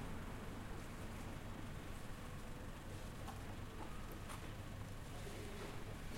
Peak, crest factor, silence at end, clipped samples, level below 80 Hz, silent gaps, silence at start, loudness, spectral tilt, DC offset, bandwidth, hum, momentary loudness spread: -36 dBFS; 12 dB; 0 s; under 0.1%; -54 dBFS; none; 0 s; -51 LUFS; -5 dB/octave; under 0.1%; 16.5 kHz; none; 2 LU